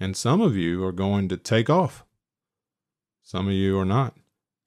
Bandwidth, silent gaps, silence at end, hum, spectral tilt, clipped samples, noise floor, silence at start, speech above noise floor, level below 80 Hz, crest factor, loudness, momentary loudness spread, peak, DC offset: 13 kHz; none; 0.55 s; none; -6.5 dB/octave; under 0.1%; -89 dBFS; 0 s; 67 dB; -58 dBFS; 16 dB; -23 LUFS; 9 LU; -8 dBFS; under 0.1%